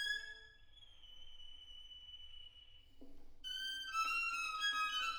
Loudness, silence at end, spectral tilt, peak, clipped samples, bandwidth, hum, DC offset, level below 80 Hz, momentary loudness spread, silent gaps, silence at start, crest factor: -39 LUFS; 0 s; 1 dB/octave; -28 dBFS; under 0.1%; over 20 kHz; none; under 0.1%; -62 dBFS; 23 LU; none; 0 s; 16 dB